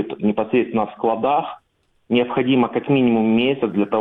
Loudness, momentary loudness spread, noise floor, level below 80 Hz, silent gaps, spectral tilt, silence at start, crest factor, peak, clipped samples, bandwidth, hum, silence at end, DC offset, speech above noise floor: -19 LUFS; 5 LU; -64 dBFS; -58 dBFS; none; -9.5 dB/octave; 0 s; 14 dB; -4 dBFS; under 0.1%; 4 kHz; none; 0 s; under 0.1%; 45 dB